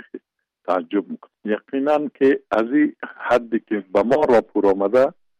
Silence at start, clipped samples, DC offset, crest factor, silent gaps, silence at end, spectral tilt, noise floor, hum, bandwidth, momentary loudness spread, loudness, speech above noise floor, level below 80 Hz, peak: 0.15 s; under 0.1%; under 0.1%; 12 dB; none; 0.3 s; -7 dB/octave; -58 dBFS; none; 9.2 kHz; 11 LU; -20 LUFS; 39 dB; -58 dBFS; -8 dBFS